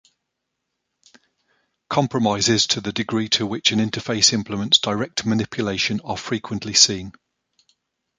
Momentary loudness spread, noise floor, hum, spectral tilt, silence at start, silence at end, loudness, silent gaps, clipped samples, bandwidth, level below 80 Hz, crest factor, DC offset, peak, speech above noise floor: 11 LU; -79 dBFS; none; -3 dB/octave; 1.9 s; 1.1 s; -19 LUFS; none; under 0.1%; 9.6 kHz; -54 dBFS; 22 dB; under 0.1%; 0 dBFS; 58 dB